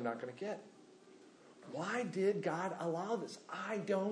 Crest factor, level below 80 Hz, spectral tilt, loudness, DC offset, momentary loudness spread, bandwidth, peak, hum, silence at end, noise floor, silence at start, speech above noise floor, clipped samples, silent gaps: 16 dB; under -90 dBFS; -6 dB/octave; -40 LUFS; under 0.1%; 13 LU; 10.5 kHz; -22 dBFS; none; 0 s; -61 dBFS; 0 s; 22 dB; under 0.1%; none